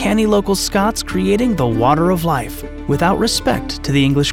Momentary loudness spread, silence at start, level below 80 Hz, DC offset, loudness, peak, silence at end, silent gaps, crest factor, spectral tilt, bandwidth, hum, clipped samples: 7 LU; 0 s; -32 dBFS; under 0.1%; -16 LUFS; -2 dBFS; 0 s; none; 14 dB; -5 dB/octave; 17.5 kHz; none; under 0.1%